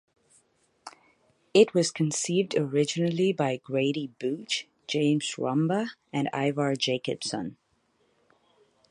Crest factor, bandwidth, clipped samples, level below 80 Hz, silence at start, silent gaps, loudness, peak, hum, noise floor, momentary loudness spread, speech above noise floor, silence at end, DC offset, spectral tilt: 22 dB; 11.5 kHz; under 0.1%; -74 dBFS; 0.85 s; none; -27 LUFS; -6 dBFS; none; -70 dBFS; 9 LU; 43 dB; 1.4 s; under 0.1%; -5 dB/octave